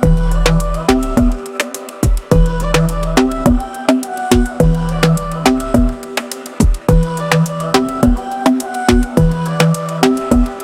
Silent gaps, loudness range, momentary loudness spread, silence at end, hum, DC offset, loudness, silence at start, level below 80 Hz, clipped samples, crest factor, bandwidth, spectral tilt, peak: none; 1 LU; 5 LU; 0 s; none; under 0.1%; -15 LUFS; 0 s; -18 dBFS; under 0.1%; 14 dB; 16 kHz; -6 dB/octave; 0 dBFS